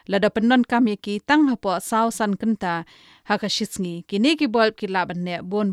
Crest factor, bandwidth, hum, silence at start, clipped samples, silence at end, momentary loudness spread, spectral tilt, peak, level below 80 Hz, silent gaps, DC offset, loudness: 16 dB; 14 kHz; none; 0.1 s; under 0.1%; 0 s; 9 LU; -5 dB/octave; -4 dBFS; -58 dBFS; none; under 0.1%; -22 LUFS